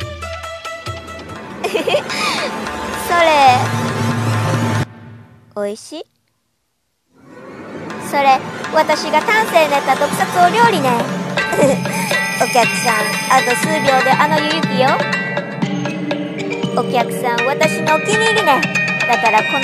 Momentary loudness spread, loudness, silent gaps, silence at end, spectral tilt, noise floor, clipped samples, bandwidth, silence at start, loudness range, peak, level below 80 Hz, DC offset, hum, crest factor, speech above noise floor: 14 LU; -15 LUFS; none; 0 s; -4 dB/octave; -68 dBFS; under 0.1%; 14 kHz; 0 s; 8 LU; 0 dBFS; -50 dBFS; under 0.1%; none; 16 dB; 54 dB